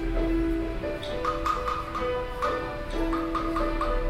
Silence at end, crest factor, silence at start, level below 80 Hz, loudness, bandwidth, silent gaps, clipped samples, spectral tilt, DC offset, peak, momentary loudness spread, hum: 0 s; 14 dB; 0 s; -34 dBFS; -29 LUFS; 14 kHz; none; under 0.1%; -6.5 dB/octave; under 0.1%; -14 dBFS; 4 LU; none